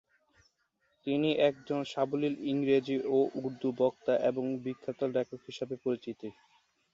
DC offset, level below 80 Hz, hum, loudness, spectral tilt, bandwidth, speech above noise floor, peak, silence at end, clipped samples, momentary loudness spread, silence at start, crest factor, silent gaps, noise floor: under 0.1%; -76 dBFS; none; -32 LUFS; -7 dB/octave; 7.6 kHz; 45 dB; -14 dBFS; 0.65 s; under 0.1%; 11 LU; 1.05 s; 18 dB; none; -76 dBFS